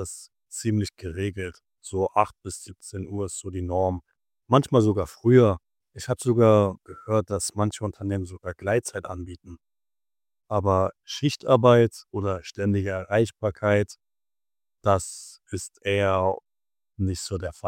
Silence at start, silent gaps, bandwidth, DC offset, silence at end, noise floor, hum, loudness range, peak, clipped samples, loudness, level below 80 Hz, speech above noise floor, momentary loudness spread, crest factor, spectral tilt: 0 s; none; 16 kHz; under 0.1%; 0 s; under -90 dBFS; none; 7 LU; -4 dBFS; under 0.1%; -24 LUFS; -52 dBFS; over 66 dB; 18 LU; 22 dB; -6 dB/octave